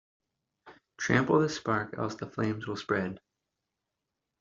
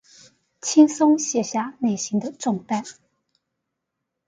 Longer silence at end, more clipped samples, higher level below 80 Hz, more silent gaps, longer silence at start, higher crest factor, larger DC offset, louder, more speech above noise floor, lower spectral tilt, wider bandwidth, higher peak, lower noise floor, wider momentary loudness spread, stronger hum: second, 1.2 s vs 1.35 s; neither; first, -64 dBFS vs -72 dBFS; neither; about the same, 0.65 s vs 0.65 s; about the same, 24 dB vs 20 dB; neither; second, -30 LUFS vs -21 LUFS; second, 56 dB vs 60 dB; first, -6 dB/octave vs -4.5 dB/octave; second, 7.8 kHz vs 9.4 kHz; second, -10 dBFS vs -2 dBFS; first, -86 dBFS vs -81 dBFS; about the same, 11 LU vs 12 LU; neither